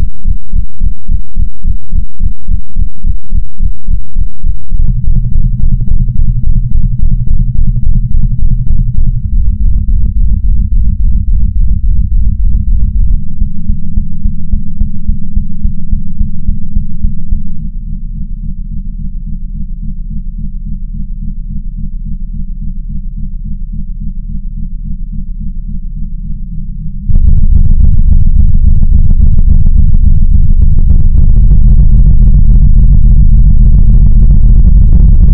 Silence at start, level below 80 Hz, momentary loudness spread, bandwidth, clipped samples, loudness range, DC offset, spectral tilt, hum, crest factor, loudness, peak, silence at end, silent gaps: 0 s; -8 dBFS; 15 LU; 0.7 kHz; 4%; 14 LU; under 0.1%; -15 dB/octave; none; 6 dB; -14 LUFS; 0 dBFS; 0 s; none